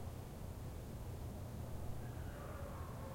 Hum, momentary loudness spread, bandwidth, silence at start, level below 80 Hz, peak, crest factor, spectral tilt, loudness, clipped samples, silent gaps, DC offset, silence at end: none; 2 LU; 16.5 kHz; 0 s; -54 dBFS; -34 dBFS; 14 dB; -6.5 dB/octave; -49 LUFS; under 0.1%; none; under 0.1%; 0 s